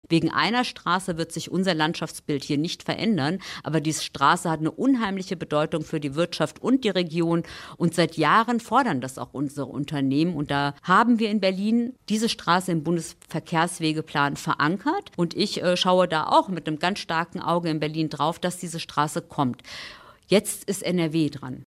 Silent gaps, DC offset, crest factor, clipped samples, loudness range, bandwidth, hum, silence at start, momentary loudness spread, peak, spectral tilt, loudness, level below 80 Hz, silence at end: none; under 0.1%; 18 dB; under 0.1%; 3 LU; 15.5 kHz; none; 0.1 s; 9 LU; -6 dBFS; -5 dB/octave; -24 LUFS; -60 dBFS; 0.05 s